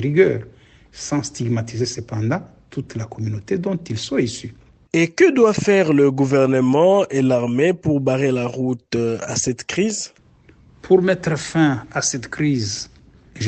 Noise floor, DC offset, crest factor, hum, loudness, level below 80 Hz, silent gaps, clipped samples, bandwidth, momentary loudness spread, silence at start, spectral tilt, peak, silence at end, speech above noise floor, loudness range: -51 dBFS; under 0.1%; 18 dB; none; -19 LUFS; -50 dBFS; none; under 0.1%; 9 kHz; 13 LU; 0 s; -5.5 dB/octave; -2 dBFS; 0 s; 32 dB; 8 LU